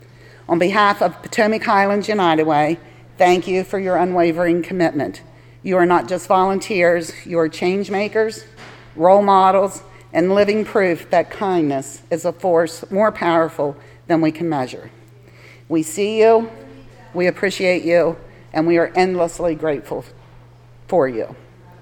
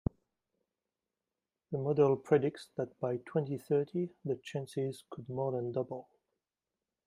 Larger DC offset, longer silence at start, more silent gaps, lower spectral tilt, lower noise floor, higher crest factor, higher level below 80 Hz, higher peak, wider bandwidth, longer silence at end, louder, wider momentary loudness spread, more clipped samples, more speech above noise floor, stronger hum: neither; second, 0.5 s vs 1.7 s; neither; second, -5.5 dB/octave vs -8 dB/octave; second, -44 dBFS vs under -90 dBFS; about the same, 18 dB vs 20 dB; first, -52 dBFS vs -64 dBFS; first, 0 dBFS vs -14 dBFS; first, 17.5 kHz vs 12.5 kHz; second, 0.45 s vs 1.05 s; first, -18 LUFS vs -35 LUFS; about the same, 11 LU vs 12 LU; neither; second, 27 dB vs over 56 dB; neither